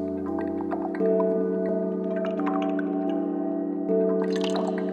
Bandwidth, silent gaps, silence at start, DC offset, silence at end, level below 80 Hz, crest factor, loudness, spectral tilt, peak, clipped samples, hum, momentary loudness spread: 9 kHz; none; 0 s; under 0.1%; 0 s; -64 dBFS; 14 dB; -26 LUFS; -7.5 dB/octave; -12 dBFS; under 0.1%; none; 5 LU